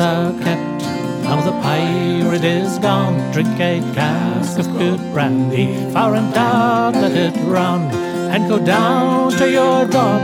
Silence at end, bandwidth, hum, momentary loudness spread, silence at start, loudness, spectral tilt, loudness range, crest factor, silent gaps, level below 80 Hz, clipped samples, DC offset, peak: 0 s; 16.5 kHz; none; 5 LU; 0 s; -16 LUFS; -6.5 dB/octave; 2 LU; 14 dB; none; -60 dBFS; under 0.1%; under 0.1%; -2 dBFS